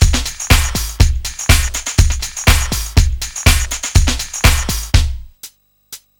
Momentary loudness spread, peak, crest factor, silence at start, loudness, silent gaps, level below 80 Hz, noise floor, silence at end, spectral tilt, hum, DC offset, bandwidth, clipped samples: 13 LU; 0 dBFS; 14 dB; 0 s; -15 LUFS; none; -16 dBFS; -40 dBFS; 0.25 s; -3 dB/octave; none; under 0.1%; 19.5 kHz; under 0.1%